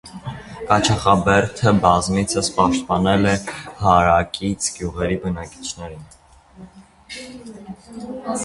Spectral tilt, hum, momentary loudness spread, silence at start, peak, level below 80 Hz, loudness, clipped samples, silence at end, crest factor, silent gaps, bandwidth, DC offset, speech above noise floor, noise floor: -5 dB/octave; none; 19 LU; 0.05 s; 0 dBFS; -40 dBFS; -18 LUFS; under 0.1%; 0 s; 20 dB; none; 11.5 kHz; under 0.1%; 25 dB; -44 dBFS